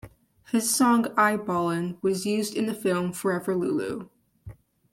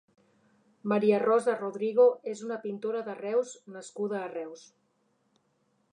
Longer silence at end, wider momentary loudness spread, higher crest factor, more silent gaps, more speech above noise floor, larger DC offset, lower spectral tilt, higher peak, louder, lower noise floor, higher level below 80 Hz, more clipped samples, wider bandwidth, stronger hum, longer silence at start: second, 0.4 s vs 1.35 s; second, 7 LU vs 16 LU; about the same, 18 dB vs 18 dB; neither; second, 22 dB vs 44 dB; neither; second, -4.5 dB/octave vs -6 dB/octave; first, -8 dBFS vs -12 dBFS; first, -25 LUFS vs -29 LUFS; second, -47 dBFS vs -73 dBFS; first, -62 dBFS vs -86 dBFS; neither; first, 16.5 kHz vs 10 kHz; neither; second, 0.05 s vs 0.85 s